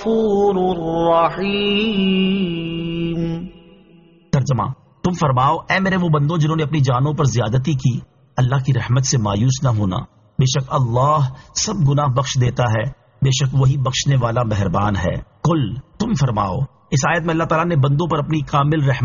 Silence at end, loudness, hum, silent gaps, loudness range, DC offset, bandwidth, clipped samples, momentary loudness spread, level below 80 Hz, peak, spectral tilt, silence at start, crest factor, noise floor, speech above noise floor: 0 s; -18 LUFS; none; none; 3 LU; under 0.1%; 7.4 kHz; under 0.1%; 7 LU; -40 dBFS; -4 dBFS; -6 dB/octave; 0 s; 14 dB; -49 dBFS; 32 dB